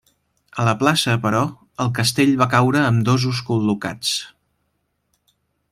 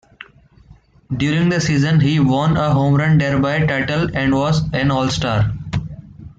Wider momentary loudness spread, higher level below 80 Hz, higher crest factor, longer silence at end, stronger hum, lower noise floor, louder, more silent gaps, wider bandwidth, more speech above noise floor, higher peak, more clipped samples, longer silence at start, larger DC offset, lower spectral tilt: about the same, 9 LU vs 10 LU; second, -56 dBFS vs -38 dBFS; first, 18 dB vs 12 dB; first, 1.45 s vs 0.1 s; neither; first, -71 dBFS vs -47 dBFS; about the same, -19 LUFS vs -17 LUFS; neither; first, 15.5 kHz vs 8 kHz; first, 53 dB vs 32 dB; about the same, -2 dBFS vs -4 dBFS; neither; second, 0.55 s vs 1.1 s; neither; second, -5 dB/octave vs -6.5 dB/octave